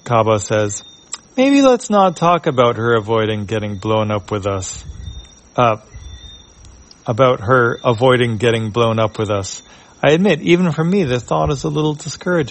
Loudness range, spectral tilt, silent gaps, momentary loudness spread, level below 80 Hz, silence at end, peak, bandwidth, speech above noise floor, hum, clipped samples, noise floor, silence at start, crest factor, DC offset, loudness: 6 LU; -5.5 dB/octave; none; 15 LU; -42 dBFS; 0 s; 0 dBFS; 8.8 kHz; 27 dB; none; under 0.1%; -42 dBFS; 0.05 s; 16 dB; under 0.1%; -16 LUFS